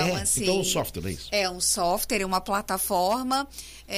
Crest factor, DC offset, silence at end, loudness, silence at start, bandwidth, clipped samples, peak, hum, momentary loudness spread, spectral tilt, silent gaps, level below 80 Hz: 14 dB; under 0.1%; 0 s; -25 LUFS; 0 s; 15.5 kHz; under 0.1%; -12 dBFS; none; 7 LU; -3 dB/octave; none; -46 dBFS